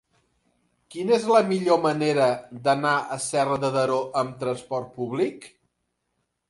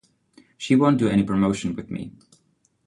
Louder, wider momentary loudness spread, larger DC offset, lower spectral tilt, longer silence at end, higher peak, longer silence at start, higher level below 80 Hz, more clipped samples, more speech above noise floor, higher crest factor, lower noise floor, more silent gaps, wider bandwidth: second, -24 LUFS vs -21 LUFS; second, 10 LU vs 16 LU; neither; second, -5 dB/octave vs -7 dB/octave; first, 1 s vs 0.75 s; about the same, -6 dBFS vs -8 dBFS; first, 0.9 s vs 0.6 s; second, -68 dBFS vs -52 dBFS; neither; first, 53 dB vs 45 dB; about the same, 20 dB vs 16 dB; first, -77 dBFS vs -66 dBFS; neither; about the same, 11.5 kHz vs 11.5 kHz